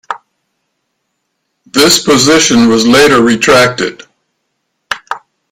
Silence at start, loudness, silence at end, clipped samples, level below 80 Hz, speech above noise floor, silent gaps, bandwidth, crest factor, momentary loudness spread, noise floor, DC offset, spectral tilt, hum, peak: 0.1 s; -7 LUFS; 0.35 s; 0.2%; -44 dBFS; 60 dB; none; 17 kHz; 10 dB; 18 LU; -67 dBFS; under 0.1%; -3 dB/octave; none; 0 dBFS